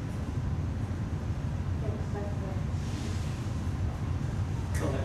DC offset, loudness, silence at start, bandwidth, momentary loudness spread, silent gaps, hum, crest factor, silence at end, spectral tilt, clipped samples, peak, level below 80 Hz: under 0.1%; -33 LUFS; 0 s; 12.5 kHz; 2 LU; none; none; 12 dB; 0 s; -7 dB/octave; under 0.1%; -20 dBFS; -38 dBFS